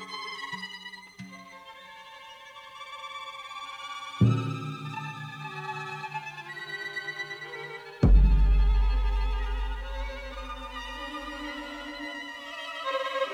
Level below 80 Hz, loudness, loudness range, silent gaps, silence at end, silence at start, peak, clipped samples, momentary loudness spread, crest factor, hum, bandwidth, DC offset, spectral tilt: -30 dBFS; -31 LUFS; 13 LU; none; 0 s; 0 s; -10 dBFS; under 0.1%; 20 LU; 20 dB; none; 8.6 kHz; under 0.1%; -6 dB/octave